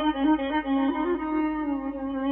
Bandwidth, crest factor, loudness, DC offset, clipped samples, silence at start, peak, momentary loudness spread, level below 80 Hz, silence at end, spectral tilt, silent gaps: 3.9 kHz; 12 dB; -26 LUFS; under 0.1%; under 0.1%; 0 s; -14 dBFS; 6 LU; -50 dBFS; 0 s; -3 dB/octave; none